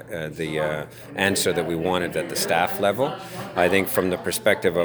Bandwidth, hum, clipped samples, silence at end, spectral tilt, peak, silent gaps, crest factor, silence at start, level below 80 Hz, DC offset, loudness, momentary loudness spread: over 20 kHz; none; under 0.1%; 0 s; -4 dB/octave; -2 dBFS; none; 20 dB; 0 s; -54 dBFS; under 0.1%; -23 LUFS; 9 LU